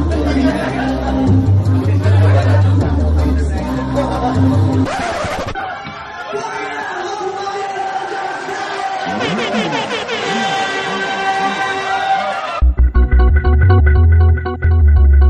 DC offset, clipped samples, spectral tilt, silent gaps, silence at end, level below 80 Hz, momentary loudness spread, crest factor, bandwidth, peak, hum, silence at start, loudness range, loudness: under 0.1%; under 0.1%; -6.5 dB/octave; none; 0 s; -18 dBFS; 11 LU; 12 dB; 9.4 kHz; 0 dBFS; none; 0 s; 8 LU; -15 LUFS